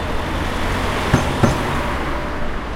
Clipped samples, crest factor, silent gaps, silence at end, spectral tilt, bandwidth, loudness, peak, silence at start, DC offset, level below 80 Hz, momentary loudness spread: under 0.1%; 18 dB; none; 0 s; -5.5 dB/octave; 16.5 kHz; -20 LUFS; -2 dBFS; 0 s; under 0.1%; -26 dBFS; 7 LU